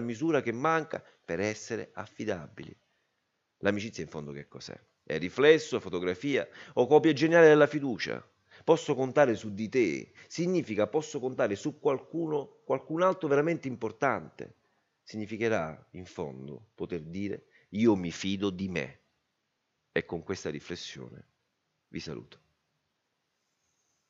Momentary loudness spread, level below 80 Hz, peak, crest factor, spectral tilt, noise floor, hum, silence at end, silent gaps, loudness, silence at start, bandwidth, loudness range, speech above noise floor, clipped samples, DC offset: 20 LU; -70 dBFS; -8 dBFS; 22 dB; -5.5 dB/octave; -80 dBFS; none; 1.85 s; none; -29 LUFS; 0 s; 7.8 kHz; 14 LU; 51 dB; under 0.1%; under 0.1%